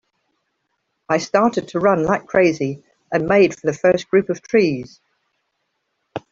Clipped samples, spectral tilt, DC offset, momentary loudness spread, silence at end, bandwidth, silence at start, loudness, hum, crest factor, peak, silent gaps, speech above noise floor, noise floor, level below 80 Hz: under 0.1%; -6 dB/octave; under 0.1%; 13 LU; 0.1 s; 7.6 kHz; 1.1 s; -18 LUFS; none; 18 dB; -2 dBFS; none; 55 dB; -73 dBFS; -56 dBFS